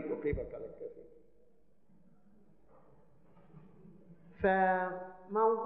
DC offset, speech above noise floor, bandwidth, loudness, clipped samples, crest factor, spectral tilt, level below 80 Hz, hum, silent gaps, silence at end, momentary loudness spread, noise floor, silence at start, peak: 0.1%; 37 dB; 4.1 kHz; -34 LUFS; under 0.1%; 20 dB; -6 dB/octave; -58 dBFS; none; none; 0 s; 19 LU; -70 dBFS; 0 s; -18 dBFS